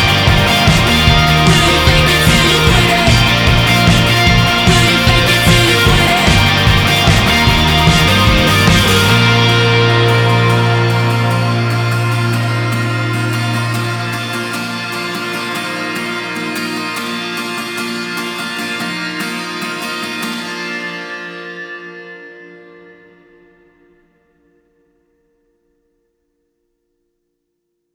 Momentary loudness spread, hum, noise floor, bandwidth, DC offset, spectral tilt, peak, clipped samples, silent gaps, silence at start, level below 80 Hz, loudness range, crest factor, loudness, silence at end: 11 LU; none; -71 dBFS; over 20 kHz; under 0.1%; -4.5 dB/octave; 0 dBFS; under 0.1%; none; 0 s; -26 dBFS; 13 LU; 14 dB; -12 LUFS; 5.4 s